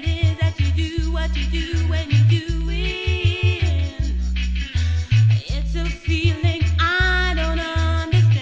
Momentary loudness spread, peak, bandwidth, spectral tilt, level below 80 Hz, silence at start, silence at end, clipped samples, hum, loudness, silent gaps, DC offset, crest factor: 7 LU; -6 dBFS; 7.8 kHz; -6 dB/octave; -24 dBFS; 0 s; 0 s; under 0.1%; none; -20 LUFS; none; 0.1%; 14 dB